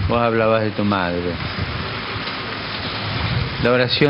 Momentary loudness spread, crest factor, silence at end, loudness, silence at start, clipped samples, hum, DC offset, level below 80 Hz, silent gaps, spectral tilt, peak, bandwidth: 8 LU; 18 dB; 0 s; -21 LUFS; 0 s; under 0.1%; none; under 0.1%; -38 dBFS; none; -8.5 dB/octave; -2 dBFS; 5.8 kHz